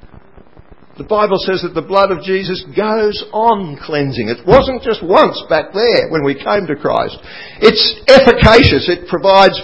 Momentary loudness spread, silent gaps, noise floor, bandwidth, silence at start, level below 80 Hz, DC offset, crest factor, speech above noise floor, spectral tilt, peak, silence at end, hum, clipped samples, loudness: 12 LU; none; -42 dBFS; 8 kHz; 0.05 s; -30 dBFS; 0.8%; 12 dB; 31 dB; -6 dB/octave; 0 dBFS; 0 s; none; 0.8%; -12 LUFS